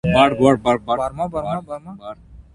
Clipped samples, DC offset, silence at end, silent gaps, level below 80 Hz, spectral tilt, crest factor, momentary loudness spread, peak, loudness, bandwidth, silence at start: under 0.1%; under 0.1%; 0.15 s; none; -42 dBFS; -6.5 dB/octave; 20 dB; 21 LU; 0 dBFS; -18 LUFS; 11.5 kHz; 0.05 s